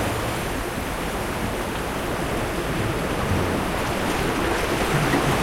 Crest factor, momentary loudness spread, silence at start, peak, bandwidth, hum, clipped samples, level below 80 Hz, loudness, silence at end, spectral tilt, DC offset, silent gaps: 16 dB; 6 LU; 0 s; -8 dBFS; 16.5 kHz; none; under 0.1%; -34 dBFS; -24 LUFS; 0 s; -5 dB/octave; under 0.1%; none